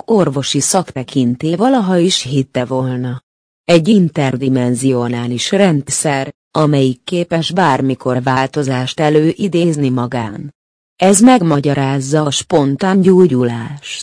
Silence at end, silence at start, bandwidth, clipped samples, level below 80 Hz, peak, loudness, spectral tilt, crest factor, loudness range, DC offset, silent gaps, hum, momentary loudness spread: 0 s; 0.1 s; 10.5 kHz; under 0.1%; -52 dBFS; 0 dBFS; -14 LUFS; -5 dB/octave; 14 dB; 3 LU; under 0.1%; 3.23-3.64 s, 6.34-6.51 s, 10.55-10.96 s; none; 10 LU